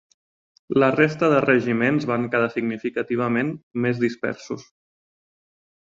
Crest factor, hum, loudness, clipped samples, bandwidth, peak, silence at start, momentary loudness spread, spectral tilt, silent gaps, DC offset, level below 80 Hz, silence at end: 20 dB; none; -22 LUFS; under 0.1%; 7.6 kHz; -4 dBFS; 0.7 s; 11 LU; -7 dB/octave; 3.63-3.71 s; under 0.1%; -64 dBFS; 1.25 s